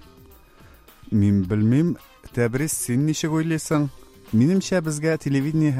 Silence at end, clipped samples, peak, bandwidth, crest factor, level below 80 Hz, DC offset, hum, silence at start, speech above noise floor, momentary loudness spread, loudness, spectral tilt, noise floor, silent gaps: 0 s; under 0.1%; -6 dBFS; 16 kHz; 16 dB; -50 dBFS; under 0.1%; none; 1.1 s; 29 dB; 6 LU; -22 LUFS; -6 dB/octave; -50 dBFS; none